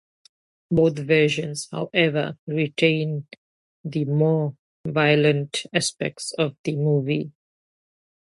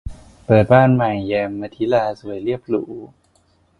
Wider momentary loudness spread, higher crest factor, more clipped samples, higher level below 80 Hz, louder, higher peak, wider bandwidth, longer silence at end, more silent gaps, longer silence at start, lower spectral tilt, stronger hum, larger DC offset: second, 10 LU vs 21 LU; about the same, 18 dB vs 18 dB; neither; second, -60 dBFS vs -42 dBFS; second, -23 LUFS vs -18 LUFS; second, -6 dBFS vs 0 dBFS; first, 11.5 kHz vs 10 kHz; first, 1.05 s vs 0.75 s; first, 2.39-2.47 s, 3.38-3.84 s, 4.59-4.84 s, 6.59-6.64 s vs none; first, 0.7 s vs 0.05 s; second, -5.5 dB/octave vs -9 dB/octave; neither; neither